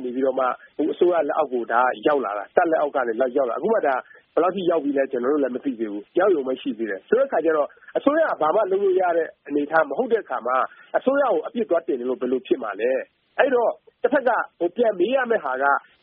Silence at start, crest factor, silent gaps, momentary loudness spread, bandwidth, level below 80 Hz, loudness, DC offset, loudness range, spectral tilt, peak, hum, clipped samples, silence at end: 0 s; 22 dB; none; 7 LU; 4.6 kHz; -74 dBFS; -22 LUFS; under 0.1%; 2 LU; -3.5 dB/octave; 0 dBFS; none; under 0.1%; 0.2 s